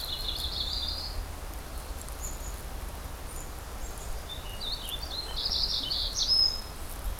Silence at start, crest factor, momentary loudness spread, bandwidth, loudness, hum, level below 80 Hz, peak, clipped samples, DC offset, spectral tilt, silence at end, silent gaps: 0 s; 18 dB; 16 LU; 17.5 kHz; -31 LUFS; none; -38 dBFS; -14 dBFS; under 0.1%; under 0.1%; -2 dB/octave; 0 s; none